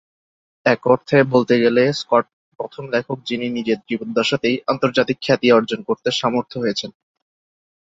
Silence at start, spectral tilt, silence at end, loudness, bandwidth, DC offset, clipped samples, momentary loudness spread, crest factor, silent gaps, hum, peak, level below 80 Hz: 0.65 s; -5.5 dB/octave; 0.9 s; -19 LUFS; 7.8 kHz; under 0.1%; under 0.1%; 10 LU; 18 dB; 2.33-2.52 s; none; -2 dBFS; -60 dBFS